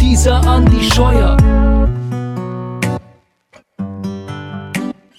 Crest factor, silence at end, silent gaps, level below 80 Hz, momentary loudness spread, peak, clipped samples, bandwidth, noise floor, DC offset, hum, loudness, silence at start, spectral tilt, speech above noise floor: 12 dB; 0.25 s; none; -16 dBFS; 16 LU; 0 dBFS; under 0.1%; 14.5 kHz; -49 dBFS; under 0.1%; none; -14 LUFS; 0 s; -5.5 dB/octave; 40 dB